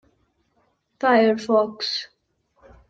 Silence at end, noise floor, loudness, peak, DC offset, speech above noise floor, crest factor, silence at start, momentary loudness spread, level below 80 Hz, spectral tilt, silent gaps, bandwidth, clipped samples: 0.85 s; -67 dBFS; -21 LUFS; -6 dBFS; under 0.1%; 48 dB; 18 dB; 1 s; 11 LU; -64 dBFS; -4.5 dB/octave; none; 7.8 kHz; under 0.1%